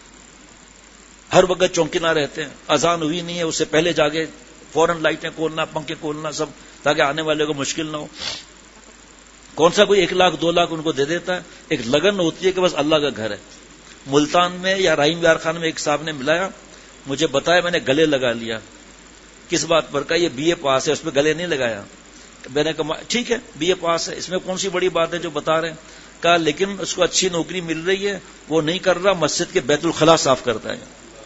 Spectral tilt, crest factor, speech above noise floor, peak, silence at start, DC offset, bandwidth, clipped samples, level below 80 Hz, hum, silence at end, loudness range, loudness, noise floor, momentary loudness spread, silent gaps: -3.5 dB/octave; 20 dB; 26 dB; 0 dBFS; 1.3 s; under 0.1%; 8 kHz; under 0.1%; -50 dBFS; none; 0 s; 3 LU; -19 LUFS; -45 dBFS; 11 LU; none